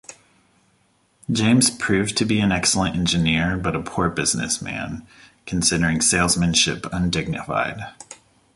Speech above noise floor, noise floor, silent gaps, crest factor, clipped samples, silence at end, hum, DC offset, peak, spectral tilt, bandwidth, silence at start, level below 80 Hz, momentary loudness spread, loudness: 42 dB; -62 dBFS; none; 18 dB; under 0.1%; 0.4 s; none; under 0.1%; -4 dBFS; -3.5 dB/octave; 12 kHz; 0.1 s; -42 dBFS; 15 LU; -20 LUFS